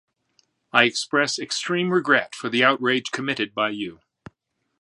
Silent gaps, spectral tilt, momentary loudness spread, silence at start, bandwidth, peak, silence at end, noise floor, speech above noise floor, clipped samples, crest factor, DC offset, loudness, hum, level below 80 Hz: none; -3.5 dB/octave; 7 LU; 0.75 s; 11.5 kHz; 0 dBFS; 0.9 s; -68 dBFS; 46 dB; under 0.1%; 24 dB; under 0.1%; -22 LUFS; none; -70 dBFS